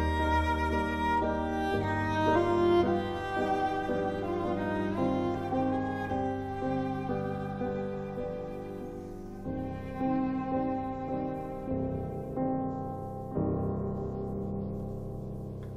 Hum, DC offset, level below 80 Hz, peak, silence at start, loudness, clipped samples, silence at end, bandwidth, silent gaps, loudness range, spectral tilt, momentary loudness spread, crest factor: none; under 0.1%; -44 dBFS; -14 dBFS; 0 s; -32 LUFS; under 0.1%; 0 s; 13 kHz; none; 7 LU; -7.5 dB/octave; 11 LU; 16 dB